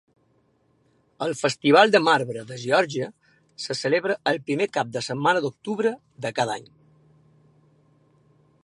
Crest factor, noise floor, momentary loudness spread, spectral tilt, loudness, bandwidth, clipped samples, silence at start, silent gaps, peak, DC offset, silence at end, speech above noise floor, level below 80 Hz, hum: 24 dB; -65 dBFS; 15 LU; -4.5 dB/octave; -23 LUFS; 11.5 kHz; under 0.1%; 1.2 s; none; -2 dBFS; under 0.1%; 2 s; 42 dB; -72 dBFS; none